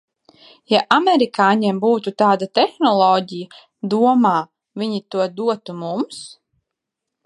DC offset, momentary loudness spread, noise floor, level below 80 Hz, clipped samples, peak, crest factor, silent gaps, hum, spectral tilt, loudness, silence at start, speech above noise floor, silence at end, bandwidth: under 0.1%; 16 LU; -82 dBFS; -72 dBFS; under 0.1%; 0 dBFS; 18 dB; none; none; -5.5 dB/octave; -18 LUFS; 0.7 s; 64 dB; 0.95 s; 11.5 kHz